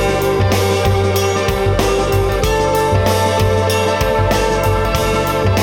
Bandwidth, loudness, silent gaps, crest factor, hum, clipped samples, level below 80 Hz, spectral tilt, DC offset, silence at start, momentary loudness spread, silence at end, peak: 19 kHz; -15 LUFS; none; 12 dB; none; under 0.1%; -26 dBFS; -5 dB/octave; under 0.1%; 0 s; 1 LU; 0 s; -2 dBFS